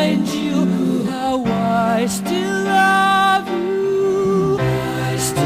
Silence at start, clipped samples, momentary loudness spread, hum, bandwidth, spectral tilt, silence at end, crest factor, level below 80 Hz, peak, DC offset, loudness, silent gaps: 0 s; under 0.1%; 6 LU; none; 16 kHz; -5 dB/octave; 0 s; 12 dB; -46 dBFS; -4 dBFS; under 0.1%; -17 LUFS; none